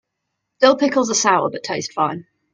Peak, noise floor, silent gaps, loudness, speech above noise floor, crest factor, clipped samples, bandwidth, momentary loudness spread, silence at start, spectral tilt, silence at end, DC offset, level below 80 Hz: 0 dBFS; -77 dBFS; none; -18 LUFS; 59 dB; 20 dB; under 0.1%; 9.6 kHz; 10 LU; 0.6 s; -3 dB/octave; 0.35 s; under 0.1%; -66 dBFS